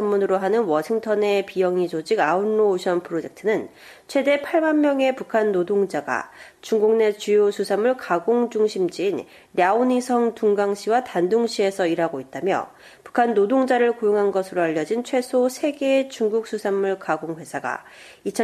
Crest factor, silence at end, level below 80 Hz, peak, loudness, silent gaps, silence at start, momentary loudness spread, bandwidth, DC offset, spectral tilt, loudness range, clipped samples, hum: 16 dB; 0 s; -70 dBFS; -6 dBFS; -22 LUFS; none; 0 s; 8 LU; 14 kHz; under 0.1%; -5 dB/octave; 1 LU; under 0.1%; none